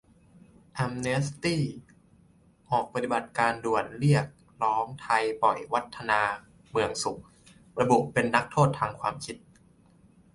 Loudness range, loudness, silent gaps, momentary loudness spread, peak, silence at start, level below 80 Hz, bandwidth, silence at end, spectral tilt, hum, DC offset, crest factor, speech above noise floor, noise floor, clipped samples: 3 LU; -28 LUFS; none; 15 LU; -6 dBFS; 0.75 s; -60 dBFS; 11.5 kHz; 1 s; -5.5 dB/octave; none; under 0.1%; 22 dB; 33 dB; -60 dBFS; under 0.1%